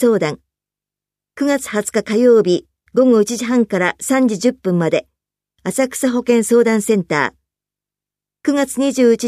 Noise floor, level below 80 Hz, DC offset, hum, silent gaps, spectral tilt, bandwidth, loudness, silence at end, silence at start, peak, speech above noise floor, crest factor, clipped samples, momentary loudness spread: -87 dBFS; -60 dBFS; under 0.1%; 50 Hz at -50 dBFS; none; -5 dB/octave; 15 kHz; -16 LUFS; 0 s; 0 s; -2 dBFS; 73 dB; 14 dB; under 0.1%; 9 LU